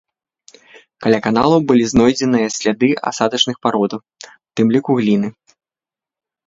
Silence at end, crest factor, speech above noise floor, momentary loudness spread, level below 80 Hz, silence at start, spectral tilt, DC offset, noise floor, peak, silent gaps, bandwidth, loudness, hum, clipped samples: 1.15 s; 18 dB; 75 dB; 8 LU; -50 dBFS; 1 s; -5 dB/octave; under 0.1%; -90 dBFS; 0 dBFS; none; 7.8 kHz; -16 LUFS; none; under 0.1%